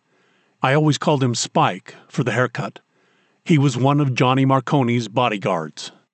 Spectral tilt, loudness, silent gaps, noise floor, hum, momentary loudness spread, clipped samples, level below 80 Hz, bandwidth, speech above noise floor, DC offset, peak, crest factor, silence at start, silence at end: -5.5 dB/octave; -19 LUFS; none; -61 dBFS; none; 13 LU; under 0.1%; -68 dBFS; 9 kHz; 42 dB; under 0.1%; -4 dBFS; 16 dB; 0.6 s; 0.25 s